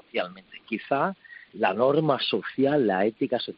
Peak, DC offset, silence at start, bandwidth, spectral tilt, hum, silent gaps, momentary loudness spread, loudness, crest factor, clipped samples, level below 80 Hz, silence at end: -8 dBFS; under 0.1%; 0.15 s; 5.6 kHz; -3.5 dB/octave; none; none; 14 LU; -25 LUFS; 18 dB; under 0.1%; -70 dBFS; 0.05 s